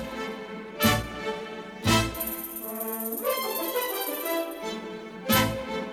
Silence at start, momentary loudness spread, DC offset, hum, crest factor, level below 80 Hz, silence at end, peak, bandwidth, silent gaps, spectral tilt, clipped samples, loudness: 0 s; 12 LU; under 0.1%; none; 22 dB; -48 dBFS; 0 s; -8 dBFS; over 20 kHz; none; -4 dB/octave; under 0.1%; -28 LUFS